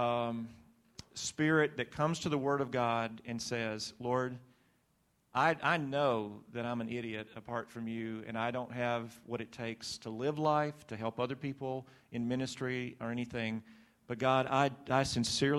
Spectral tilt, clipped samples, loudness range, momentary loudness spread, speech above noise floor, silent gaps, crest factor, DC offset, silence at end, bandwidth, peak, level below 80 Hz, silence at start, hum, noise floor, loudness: -5 dB/octave; under 0.1%; 5 LU; 11 LU; 40 dB; none; 22 dB; under 0.1%; 0 s; 13.5 kHz; -14 dBFS; -68 dBFS; 0 s; none; -75 dBFS; -35 LUFS